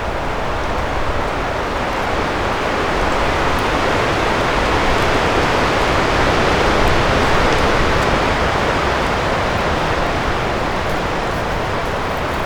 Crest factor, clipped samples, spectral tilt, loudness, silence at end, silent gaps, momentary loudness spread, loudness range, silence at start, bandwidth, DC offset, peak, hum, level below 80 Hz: 16 dB; under 0.1%; -5 dB/octave; -17 LUFS; 0 s; none; 6 LU; 4 LU; 0 s; over 20 kHz; under 0.1%; 0 dBFS; none; -26 dBFS